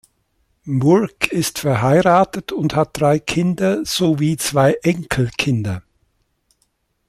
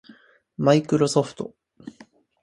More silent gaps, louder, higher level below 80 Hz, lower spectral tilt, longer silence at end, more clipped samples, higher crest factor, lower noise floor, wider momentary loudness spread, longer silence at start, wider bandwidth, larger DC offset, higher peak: neither; first, -17 LUFS vs -21 LUFS; first, -48 dBFS vs -62 dBFS; about the same, -5.5 dB/octave vs -6 dB/octave; first, 1.3 s vs 0.55 s; neither; about the same, 18 dB vs 20 dB; first, -66 dBFS vs -53 dBFS; second, 7 LU vs 24 LU; about the same, 0.65 s vs 0.6 s; first, 15.5 kHz vs 11.5 kHz; neither; first, 0 dBFS vs -4 dBFS